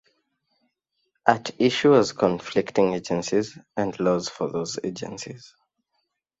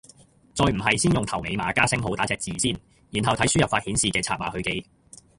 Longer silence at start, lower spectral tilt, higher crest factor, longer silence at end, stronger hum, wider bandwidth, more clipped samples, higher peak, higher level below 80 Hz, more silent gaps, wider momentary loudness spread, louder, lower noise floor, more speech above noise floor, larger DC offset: first, 1.25 s vs 0.55 s; first, -5 dB/octave vs -3.5 dB/octave; about the same, 24 dB vs 22 dB; first, 0.95 s vs 0.55 s; neither; second, 8 kHz vs 11.5 kHz; neither; about the same, -2 dBFS vs -4 dBFS; second, -62 dBFS vs -44 dBFS; neither; first, 15 LU vs 8 LU; about the same, -24 LUFS vs -24 LUFS; first, -76 dBFS vs -54 dBFS; first, 53 dB vs 30 dB; neither